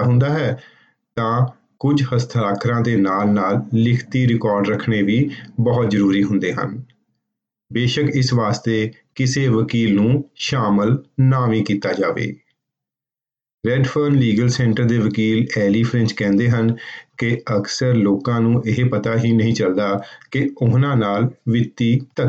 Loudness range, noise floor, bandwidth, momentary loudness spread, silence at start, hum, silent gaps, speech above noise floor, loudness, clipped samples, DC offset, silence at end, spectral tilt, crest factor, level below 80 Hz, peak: 2 LU; under -90 dBFS; 8 kHz; 6 LU; 0 s; none; 13.54-13.58 s; over 73 dB; -18 LUFS; under 0.1%; under 0.1%; 0 s; -7 dB/octave; 12 dB; -52 dBFS; -6 dBFS